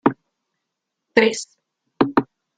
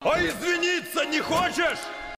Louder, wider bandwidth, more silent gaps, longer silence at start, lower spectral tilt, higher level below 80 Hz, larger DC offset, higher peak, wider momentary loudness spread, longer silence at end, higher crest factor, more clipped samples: first, -20 LUFS vs -25 LUFS; second, 9.4 kHz vs 16 kHz; neither; about the same, 0.05 s vs 0 s; first, -4.5 dB/octave vs -3 dB/octave; second, -58 dBFS vs -50 dBFS; neither; first, -2 dBFS vs -10 dBFS; first, 18 LU vs 3 LU; first, 0.35 s vs 0 s; first, 22 dB vs 16 dB; neither